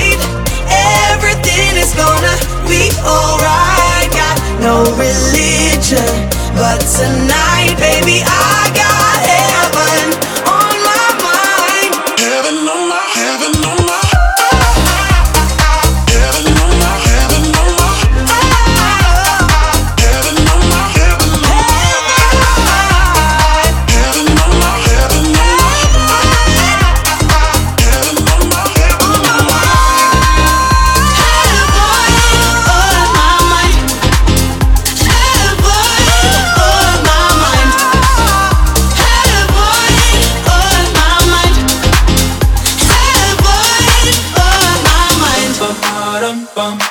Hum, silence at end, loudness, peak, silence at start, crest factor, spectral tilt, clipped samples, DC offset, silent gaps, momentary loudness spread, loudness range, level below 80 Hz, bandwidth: none; 0 s; -9 LUFS; 0 dBFS; 0 s; 10 dB; -3.5 dB/octave; 0.6%; under 0.1%; none; 4 LU; 2 LU; -14 dBFS; over 20 kHz